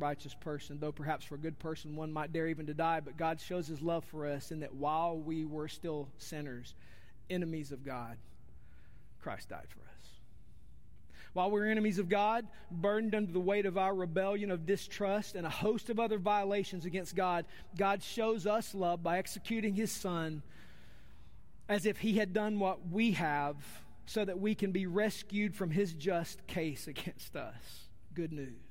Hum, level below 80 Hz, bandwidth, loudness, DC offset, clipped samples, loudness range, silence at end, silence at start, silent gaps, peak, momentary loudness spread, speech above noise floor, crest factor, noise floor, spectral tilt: none; -62 dBFS; 16 kHz; -36 LUFS; 0.4%; under 0.1%; 10 LU; 0.05 s; 0 s; none; -18 dBFS; 13 LU; 23 dB; 18 dB; -59 dBFS; -5.5 dB/octave